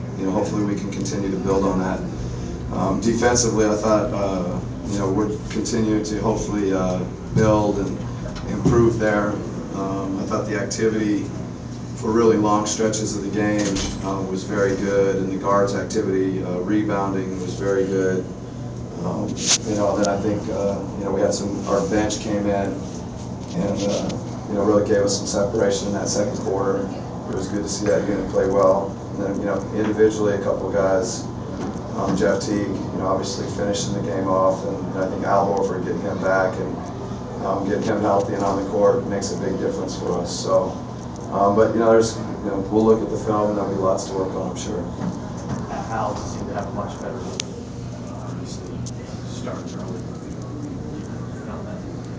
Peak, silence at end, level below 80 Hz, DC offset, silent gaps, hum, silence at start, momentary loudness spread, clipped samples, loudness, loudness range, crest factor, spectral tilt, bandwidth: 0 dBFS; 0 s; -40 dBFS; under 0.1%; none; none; 0 s; 13 LU; under 0.1%; -22 LUFS; 6 LU; 22 dB; -5.5 dB/octave; 8 kHz